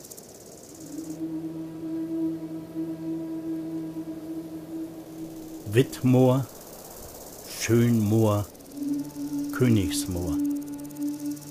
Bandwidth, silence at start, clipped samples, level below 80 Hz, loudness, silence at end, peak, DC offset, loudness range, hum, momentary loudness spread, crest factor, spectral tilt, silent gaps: 15.5 kHz; 0 s; under 0.1%; -54 dBFS; -28 LUFS; 0 s; -8 dBFS; under 0.1%; 9 LU; none; 19 LU; 20 dB; -6.5 dB/octave; none